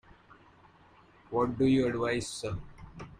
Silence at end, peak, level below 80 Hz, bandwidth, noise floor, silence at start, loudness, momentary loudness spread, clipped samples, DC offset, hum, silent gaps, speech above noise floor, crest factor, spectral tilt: 0.05 s; -16 dBFS; -54 dBFS; 11.5 kHz; -59 dBFS; 1.3 s; -30 LUFS; 18 LU; under 0.1%; under 0.1%; none; none; 30 dB; 16 dB; -6 dB/octave